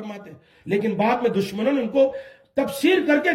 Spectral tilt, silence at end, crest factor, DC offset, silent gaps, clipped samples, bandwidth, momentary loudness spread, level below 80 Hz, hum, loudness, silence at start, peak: -5.5 dB/octave; 0 s; 16 dB; under 0.1%; none; under 0.1%; 16 kHz; 17 LU; -62 dBFS; none; -22 LUFS; 0 s; -6 dBFS